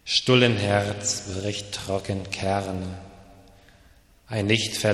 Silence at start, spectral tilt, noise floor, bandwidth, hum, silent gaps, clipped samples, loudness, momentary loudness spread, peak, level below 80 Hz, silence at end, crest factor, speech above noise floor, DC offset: 0.05 s; -4 dB/octave; -55 dBFS; 13.5 kHz; none; none; under 0.1%; -24 LUFS; 13 LU; -4 dBFS; -54 dBFS; 0 s; 22 dB; 31 dB; under 0.1%